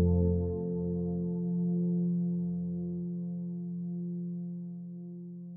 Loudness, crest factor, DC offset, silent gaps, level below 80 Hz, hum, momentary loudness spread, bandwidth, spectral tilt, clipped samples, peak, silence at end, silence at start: -34 LUFS; 14 dB; under 0.1%; none; -50 dBFS; none; 12 LU; 1.1 kHz; -16 dB/octave; under 0.1%; -18 dBFS; 0 s; 0 s